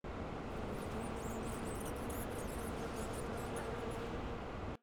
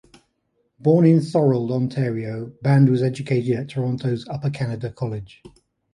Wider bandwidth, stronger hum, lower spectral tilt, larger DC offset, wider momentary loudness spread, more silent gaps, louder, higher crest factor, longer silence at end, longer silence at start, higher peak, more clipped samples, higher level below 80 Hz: first, over 20 kHz vs 11 kHz; neither; second, -5.5 dB/octave vs -9 dB/octave; neither; second, 2 LU vs 12 LU; neither; second, -43 LUFS vs -21 LUFS; about the same, 12 dB vs 16 dB; second, 0.05 s vs 0.45 s; second, 0.05 s vs 0.85 s; second, -30 dBFS vs -4 dBFS; neither; first, -50 dBFS vs -58 dBFS